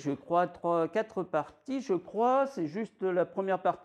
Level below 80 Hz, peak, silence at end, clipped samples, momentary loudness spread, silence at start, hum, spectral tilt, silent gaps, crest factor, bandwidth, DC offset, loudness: -74 dBFS; -14 dBFS; 0.05 s; under 0.1%; 7 LU; 0 s; none; -7 dB/octave; none; 16 dB; 9.8 kHz; under 0.1%; -31 LUFS